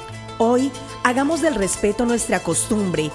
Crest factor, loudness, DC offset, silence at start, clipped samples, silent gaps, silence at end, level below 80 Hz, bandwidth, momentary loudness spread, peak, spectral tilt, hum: 18 dB; -20 LUFS; under 0.1%; 0 s; under 0.1%; none; 0 s; -44 dBFS; 12 kHz; 3 LU; -2 dBFS; -4 dB/octave; none